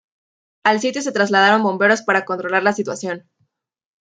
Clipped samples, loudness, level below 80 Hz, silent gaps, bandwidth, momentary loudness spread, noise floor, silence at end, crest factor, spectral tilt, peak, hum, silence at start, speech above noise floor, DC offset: under 0.1%; -17 LUFS; -70 dBFS; none; 9.4 kHz; 11 LU; -68 dBFS; 0.85 s; 18 dB; -4 dB/octave; -2 dBFS; none; 0.65 s; 51 dB; under 0.1%